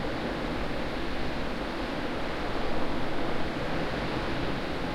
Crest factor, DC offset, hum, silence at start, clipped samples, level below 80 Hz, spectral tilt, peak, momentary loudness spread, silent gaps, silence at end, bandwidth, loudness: 12 dB; under 0.1%; none; 0 s; under 0.1%; -40 dBFS; -6 dB/octave; -16 dBFS; 2 LU; none; 0 s; 12 kHz; -32 LUFS